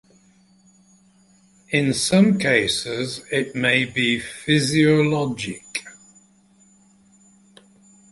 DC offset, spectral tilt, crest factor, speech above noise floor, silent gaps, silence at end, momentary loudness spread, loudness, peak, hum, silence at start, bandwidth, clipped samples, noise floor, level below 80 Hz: under 0.1%; -4.5 dB/octave; 20 dB; 36 dB; none; 2.2 s; 12 LU; -20 LUFS; -2 dBFS; none; 1.7 s; 11.5 kHz; under 0.1%; -56 dBFS; -56 dBFS